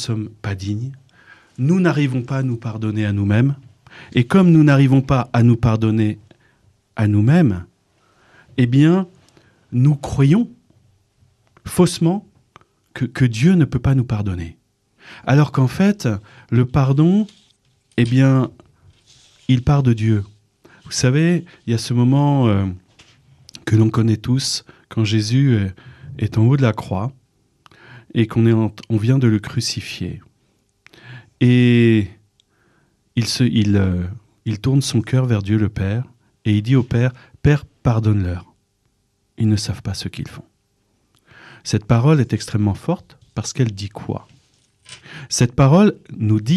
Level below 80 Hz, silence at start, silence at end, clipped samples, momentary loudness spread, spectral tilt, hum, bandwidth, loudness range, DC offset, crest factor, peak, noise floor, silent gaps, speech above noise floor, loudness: -44 dBFS; 0 s; 0 s; under 0.1%; 14 LU; -6.5 dB/octave; none; 12.5 kHz; 5 LU; under 0.1%; 14 dB; -4 dBFS; -65 dBFS; none; 49 dB; -18 LUFS